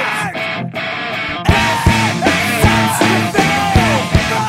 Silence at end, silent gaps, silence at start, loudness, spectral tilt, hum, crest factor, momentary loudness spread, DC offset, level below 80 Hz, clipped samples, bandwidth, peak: 0 s; none; 0 s; -14 LUFS; -4.5 dB/octave; none; 14 dB; 8 LU; under 0.1%; -28 dBFS; under 0.1%; 16 kHz; -2 dBFS